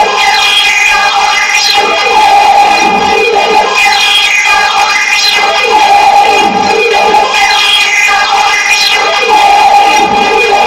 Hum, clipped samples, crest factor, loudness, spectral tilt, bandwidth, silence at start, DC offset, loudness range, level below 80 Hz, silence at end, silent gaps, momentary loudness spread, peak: none; 3%; 6 dB; -5 LUFS; -0.5 dB/octave; 16.5 kHz; 0 s; under 0.1%; 0 LU; -40 dBFS; 0 s; none; 3 LU; 0 dBFS